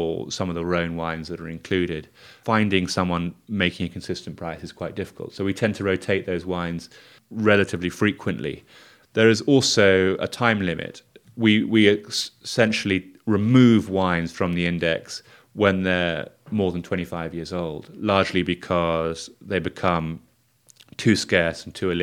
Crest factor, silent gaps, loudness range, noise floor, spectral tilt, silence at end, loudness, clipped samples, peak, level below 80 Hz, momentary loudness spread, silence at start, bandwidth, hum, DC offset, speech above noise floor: 22 dB; none; 6 LU; -58 dBFS; -5.5 dB/octave; 0 s; -22 LUFS; under 0.1%; 0 dBFS; -52 dBFS; 15 LU; 0 s; 15 kHz; none; under 0.1%; 36 dB